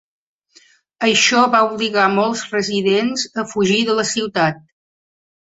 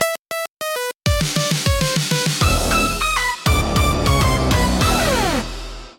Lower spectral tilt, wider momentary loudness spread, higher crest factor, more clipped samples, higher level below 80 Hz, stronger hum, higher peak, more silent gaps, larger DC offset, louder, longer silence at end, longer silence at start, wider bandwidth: about the same, -3 dB/octave vs -4 dB/octave; about the same, 8 LU vs 8 LU; about the same, 18 dB vs 18 dB; neither; second, -62 dBFS vs -26 dBFS; neither; about the same, -2 dBFS vs 0 dBFS; second, none vs 0.19-0.25 s, 0.50-0.57 s; neither; about the same, -16 LUFS vs -18 LUFS; first, 0.9 s vs 0.05 s; first, 1 s vs 0 s; second, 8.2 kHz vs 17 kHz